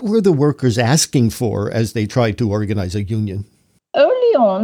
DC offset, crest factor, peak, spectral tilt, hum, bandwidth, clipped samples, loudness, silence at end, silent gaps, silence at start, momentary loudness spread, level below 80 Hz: under 0.1%; 14 dB; -2 dBFS; -5.5 dB/octave; none; 19.5 kHz; under 0.1%; -17 LUFS; 0 s; none; 0 s; 8 LU; -48 dBFS